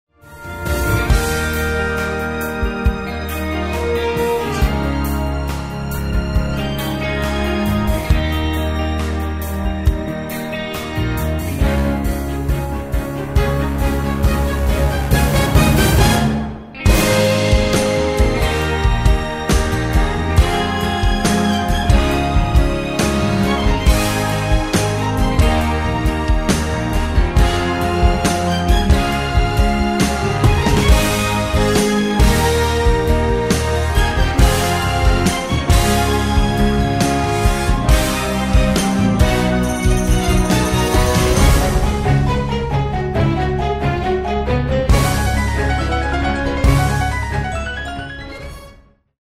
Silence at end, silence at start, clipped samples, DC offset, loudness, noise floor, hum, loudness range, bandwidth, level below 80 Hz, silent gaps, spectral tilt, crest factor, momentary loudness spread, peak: 0.5 s; 0.25 s; under 0.1%; under 0.1%; -17 LUFS; -46 dBFS; none; 5 LU; 16 kHz; -20 dBFS; none; -5.5 dB/octave; 16 dB; 7 LU; 0 dBFS